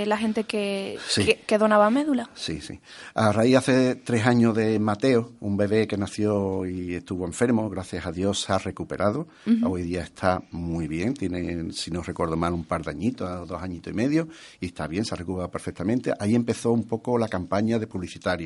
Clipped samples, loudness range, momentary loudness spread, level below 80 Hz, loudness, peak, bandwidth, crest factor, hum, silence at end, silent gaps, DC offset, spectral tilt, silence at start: under 0.1%; 6 LU; 12 LU; -52 dBFS; -25 LUFS; -4 dBFS; 11.5 kHz; 20 dB; none; 0 s; none; under 0.1%; -6 dB/octave; 0 s